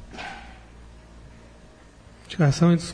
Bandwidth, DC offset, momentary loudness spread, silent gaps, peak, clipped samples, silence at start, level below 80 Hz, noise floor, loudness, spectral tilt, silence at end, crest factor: 10 kHz; under 0.1%; 26 LU; none; -8 dBFS; under 0.1%; 0 s; -48 dBFS; -49 dBFS; -23 LUFS; -6.5 dB/octave; 0 s; 18 dB